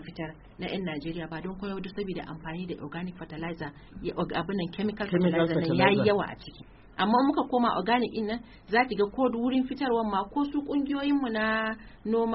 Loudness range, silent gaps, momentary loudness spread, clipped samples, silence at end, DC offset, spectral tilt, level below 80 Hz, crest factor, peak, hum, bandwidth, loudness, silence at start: 10 LU; none; 13 LU; under 0.1%; 0 s; under 0.1%; -4.5 dB/octave; -54 dBFS; 22 dB; -6 dBFS; none; 5.8 kHz; -29 LUFS; 0 s